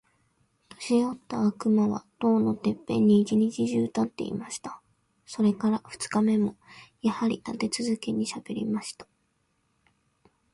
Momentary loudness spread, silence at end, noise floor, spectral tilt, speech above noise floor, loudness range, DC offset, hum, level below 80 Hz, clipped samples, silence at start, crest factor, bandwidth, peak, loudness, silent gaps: 10 LU; 1.5 s; -73 dBFS; -6 dB/octave; 46 dB; 6 LU; under 0.1%; none; -66 dBFS; under 0.1%; 0.8 s; 16 dB; 11.5 kHz; -10 dBFS; -27 LUFS; none